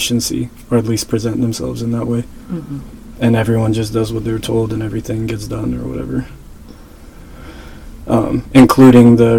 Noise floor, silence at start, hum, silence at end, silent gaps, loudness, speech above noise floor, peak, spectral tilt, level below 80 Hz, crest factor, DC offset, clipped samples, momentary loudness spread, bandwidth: -36 dBFS; 0 s; none; 0 s; none; -14 LUFS; 23 dB; 0 dBFS; -6.5 dB/octave; -36 dBFS; 14 dB; under 0.1%; 0.3%; 22 LU; 16.5 kHz